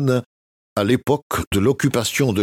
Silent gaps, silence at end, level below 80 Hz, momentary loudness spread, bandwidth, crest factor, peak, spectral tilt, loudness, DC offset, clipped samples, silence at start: 0.26-0.76 s, 1.22-1.30 s, 1.47-1.51 s; 0 s; -44 dBFS; 5 LU; 17 kHz; 16 dB; -4 dBFS; -5.5 dB/octave; -20 LUFS; under 0.1%; under 0.1%; 0 s